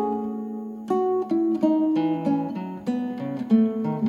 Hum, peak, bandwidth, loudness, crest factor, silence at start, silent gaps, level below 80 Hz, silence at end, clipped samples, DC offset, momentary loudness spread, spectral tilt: none; -8 dBFS; 7.2 kHz; -24 LUFS; 16 dB; 0 s; none; -70 dBFS; 0 s; under 0.1%; under 0.1%; 10 LU; -9 dB/octave